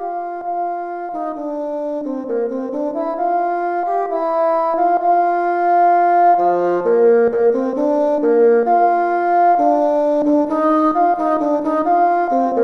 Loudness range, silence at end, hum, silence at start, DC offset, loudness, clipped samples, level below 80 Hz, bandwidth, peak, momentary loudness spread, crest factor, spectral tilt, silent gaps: 7 LU; 0 s; none; 0 s; under 0.1%; -16 LUFS; under 0.1%; -58 dBFS; 6.2 kHz; -4 dBFS; 10 LU; 12 dB; -7.5 dB/octave; none